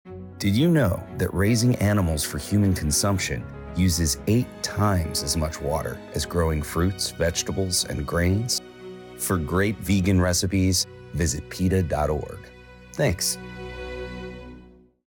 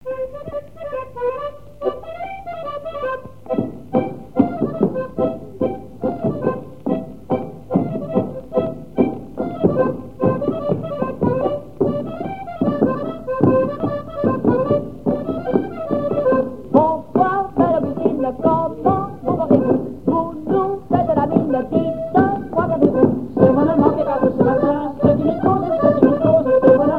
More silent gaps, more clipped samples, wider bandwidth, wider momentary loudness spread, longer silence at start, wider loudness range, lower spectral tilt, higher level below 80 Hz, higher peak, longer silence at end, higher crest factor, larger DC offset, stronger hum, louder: neither; neither; first, 20 kHz vs 5 kHz; first, 14 LU vs 11 LU; about the same, 0.05 s vs 0.05 s; second, 4 LU vs 7 LU; second, -4.5 dB/octave vs -10 dB/octave; first, -40 dBFS vs -46 dBFS; second, -10 dBFS vs 0 dBFS; first, 0.45 s vs 0 s; about the same, 14 dB vs 18 dB; second, under 0.1% vs 0.9%; neither; second, -24 LUFS vs -19 LUFS